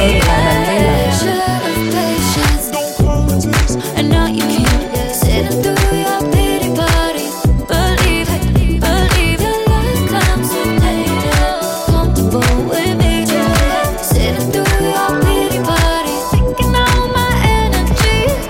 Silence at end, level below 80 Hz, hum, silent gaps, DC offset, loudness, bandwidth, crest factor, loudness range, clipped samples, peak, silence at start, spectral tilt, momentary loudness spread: 0 s; -18 dBFS; none; none; under 0.1%; -14 LUFS; 17 kHz; 12 dB; 1 LU; under 0.1%; 0 dBFS; 0 s; -5 dB/octave; 3 LU